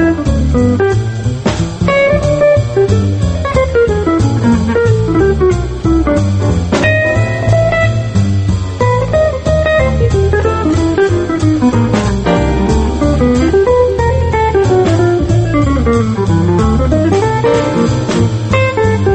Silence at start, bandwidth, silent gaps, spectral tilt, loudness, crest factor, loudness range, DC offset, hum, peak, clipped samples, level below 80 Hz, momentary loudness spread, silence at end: 0 s; 8.6 kHz; none; -7 dB/octave; -12 LUFS; 10 dB; 1 LU; under 0.1%; none; 0 dBFS; under 0.1%; -22 dBFS; 3 LU; 0 s